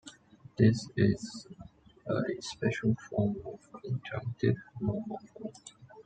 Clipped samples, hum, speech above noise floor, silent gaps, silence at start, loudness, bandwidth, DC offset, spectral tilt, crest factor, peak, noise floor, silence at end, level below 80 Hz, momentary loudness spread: under 0.1%; none; 22 dB; none; 0.05 s; -32 LUFS; 9.2 kHz; under 0.1%; -7 dB/octave; 20 dB; -12 dBFS; -54 dBFS; 0.05 s; -60 dBFS; 20 LU